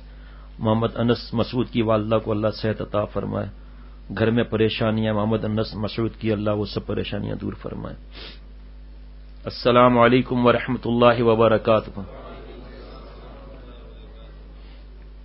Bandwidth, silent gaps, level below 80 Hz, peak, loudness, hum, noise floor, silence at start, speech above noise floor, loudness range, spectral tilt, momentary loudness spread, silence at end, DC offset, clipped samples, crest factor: 5.8 kHz; none; -40 dBFS; -2 dBFS; -21 LUFS; none; -41 dBFS; 0 s; 20 dB; 10 LU; -11.5 dB/octave; 24 LU; 0 s; under 0.1%; under 0.1%; 22 dB